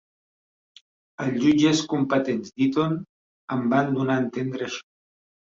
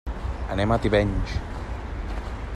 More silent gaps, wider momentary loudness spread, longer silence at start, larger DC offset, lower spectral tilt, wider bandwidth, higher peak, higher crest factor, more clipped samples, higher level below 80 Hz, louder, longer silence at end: first, 3.09-3.48 s vs none; about the same, 11 LU vs 13 LU; first, 1.2 s vs 0.05 s; neither; second, -5.5 dB/octave vs -7 dB/octave; second, 7.8 kHz vs 11 kHz; about the same, -8 dBFS vs -6 dBFS; about the same, 16 dB vs 18 dB; neither; second, -64 dBFS vs -32 dBFS; first, -24 LUFS vs -27 LUFS; first, 0.6 s vs 0 s